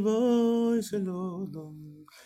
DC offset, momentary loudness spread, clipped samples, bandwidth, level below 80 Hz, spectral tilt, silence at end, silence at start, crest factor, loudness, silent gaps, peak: under 0.1%; 21 LU; under 0.1%; 14.5 kHz; -70 dBFS; -7 dB/octave; 0.2 s; 0 s; 12 dB; -28 LUFS; none; -16 dBFS